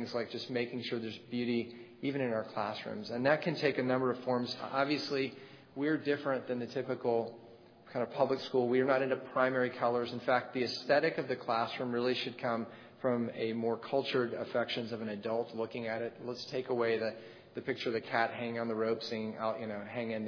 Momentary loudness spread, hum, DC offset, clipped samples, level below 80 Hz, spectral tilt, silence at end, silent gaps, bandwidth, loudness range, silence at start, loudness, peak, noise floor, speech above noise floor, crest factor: 9 LU; none; under 0.1%; under 0.1%; -80 dBFS; -3.5 dB/octave; 0 s; none; 5.4 kHz; 4 LU; 0 s; -34 LUFS; -14 dBFS; -56 dBFS; 22 dB; 22 dB